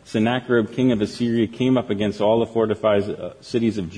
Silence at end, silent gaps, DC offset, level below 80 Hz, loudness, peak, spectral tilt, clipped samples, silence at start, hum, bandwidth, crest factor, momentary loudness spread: 0 s; none; under 0.1%; -54 dBFS; -21 LUFS; -6 dBFS; -7 dB/octave; under 0.1%; 0.05 s; none; 10.5 kHz; 14 dB; 4 LU